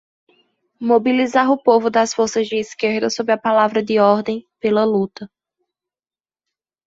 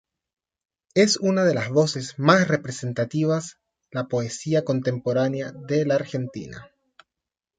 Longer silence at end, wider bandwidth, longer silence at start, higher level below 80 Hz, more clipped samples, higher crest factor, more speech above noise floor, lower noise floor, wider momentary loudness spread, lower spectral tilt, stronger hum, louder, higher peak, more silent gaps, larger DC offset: first, 1.6 s vs 0.95 s; second, 8 kHz vs 9.4 kHz; second, 0.8 s vs 0.95 s; about the same, -64 dBFS vs -64 dBFS; neither; second, 16 dB vs 22 dB; first, over 73 dB vs 65 dB; about the same, under -90 dBFS vs -87 dBFS; second, 8 LU vs 13 LU; about the same, -4.5 dB/octave vs -5.5 dB/octave; neither; first, -17 LUFS vs -23 LUFS; about the same, -2 dBFS vs -2 dBFS; neither; neither